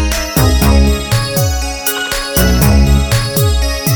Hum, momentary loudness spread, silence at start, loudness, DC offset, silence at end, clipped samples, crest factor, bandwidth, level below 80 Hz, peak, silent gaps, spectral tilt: none; 6 LU; 0 s; -12 LUFS; under 0.1%; 0 s; under 0.1%; 12 dB; over 20 kHz; -16 dBFS; 0 dBFS; none; -4.5 dB/octave